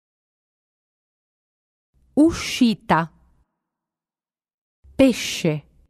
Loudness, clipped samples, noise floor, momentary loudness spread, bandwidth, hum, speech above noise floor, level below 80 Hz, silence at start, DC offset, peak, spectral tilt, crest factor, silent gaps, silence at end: -20 LUFS; under 0.1%; under -90 dBFS; 8 LU; 14 kHz; none; over 71 dB; -50 dBFS; 2.15 s; under 0.1%; -4 dBFS; -5 dB/octave; 20 dB; 4.54-4.83 s; 0.3 s